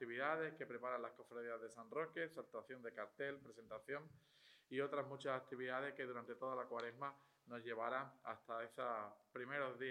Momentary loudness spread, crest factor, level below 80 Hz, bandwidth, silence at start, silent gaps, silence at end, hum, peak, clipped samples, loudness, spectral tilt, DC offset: 9 LU; 22 dB; under -90 dBFS; 14.5 kHz; 0 s; none; 0 s; none; -26 dBFS; under 0.1%; -48 LUFS; -5.5 dB/octave; under 0.1%